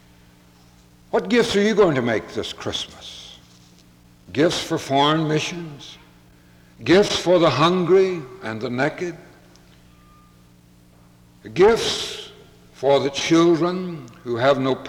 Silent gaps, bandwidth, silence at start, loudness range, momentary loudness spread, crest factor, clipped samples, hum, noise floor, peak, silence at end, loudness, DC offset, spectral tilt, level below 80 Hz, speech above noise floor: none; 16 kHz; 1.15 s; 5 LU; 18 LU; 16 dB; under 0.1%; none; -51 dBFS; -4 dBFS; 0 s; -20 LUFS; under 0.1%; -5 dB/octave; -52 dBFS; 32 dB